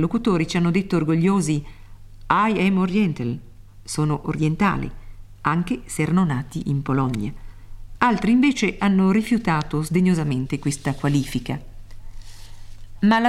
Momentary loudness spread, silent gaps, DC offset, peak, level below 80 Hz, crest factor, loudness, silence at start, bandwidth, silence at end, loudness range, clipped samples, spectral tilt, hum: 10 LU; none; 0.1%; -2 dBFS; -40 dBFS; 20 dB; -21 LUFS; 0 s; 13 kHz; 0 s; 4 LU; under 0.1%; -6.5 dB/octave; none